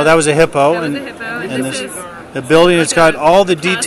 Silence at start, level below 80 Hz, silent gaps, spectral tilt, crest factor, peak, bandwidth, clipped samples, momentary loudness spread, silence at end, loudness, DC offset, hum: 0 s; -46 dBFS; none; -4 dB/octave; 12 dB; 0 dBFS; 14 kHz; 0.2%; 15 LU; 0 s; -12 LUFS; under 0.1%; none